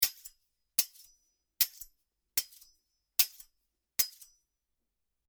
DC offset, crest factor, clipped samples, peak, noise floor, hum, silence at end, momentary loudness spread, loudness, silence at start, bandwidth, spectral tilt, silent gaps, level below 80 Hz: under 0.1%; 32 dB; under 0.1%; -6 dBFS; -84 dBFS; none; 1.2 s; 22 LU; -31 LUFS; 0 s; over 20 kHz; 2.5 dB/octave; none; -72 dBFS